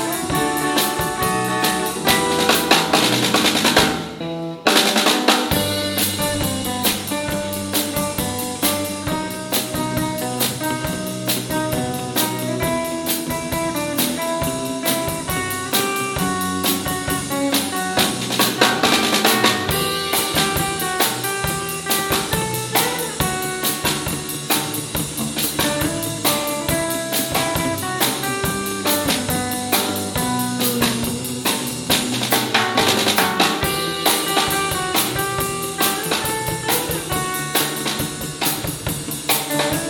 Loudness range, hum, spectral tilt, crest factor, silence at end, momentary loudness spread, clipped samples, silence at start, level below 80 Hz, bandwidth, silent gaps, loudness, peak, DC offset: 5 LU; none; -3 dB/octave; 20 dB; 0 s; 7 LU; under 0.1%; 0 s; -42 dBFS; 17.5 kHz; none; -19 LUFS; 0 dBFS; under 0.1%